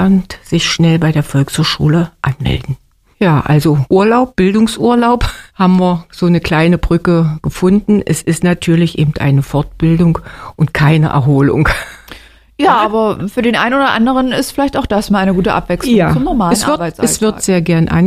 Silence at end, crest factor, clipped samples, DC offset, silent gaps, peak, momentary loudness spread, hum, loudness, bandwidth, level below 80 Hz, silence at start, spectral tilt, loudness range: 0 s; 12 dB; under 0.1%; under 0.1%; none; 0 dBFS; 5 LU; none; -12 LUFS; 15 kHz; -30 dBFS; 0 s; -6 dB/octave; 2 LU